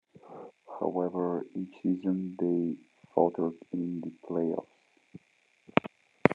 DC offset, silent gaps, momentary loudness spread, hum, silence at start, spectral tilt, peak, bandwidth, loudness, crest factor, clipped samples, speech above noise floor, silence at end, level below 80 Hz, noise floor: under 0.1%; none; 18 LU; none; 0.25 s; -8.5 dB/octave; -2 dBFS; 7 kHz; -32 LUFS; 32 dB; under 0.1%; 37 dB; 0 s; -72 dBFS; -68 dBFS